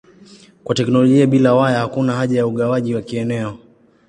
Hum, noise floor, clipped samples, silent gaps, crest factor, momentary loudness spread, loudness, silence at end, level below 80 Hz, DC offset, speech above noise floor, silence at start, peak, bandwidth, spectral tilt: none; -45 dBFS; under 0.1%; none; 16 dB; 10 LU; -16 LUFS; 0.5 s; -56 dBFS; under 0.1%; 29 dB; 0.65 s; -2 dBFS; 10 kHz; -7 dB/octave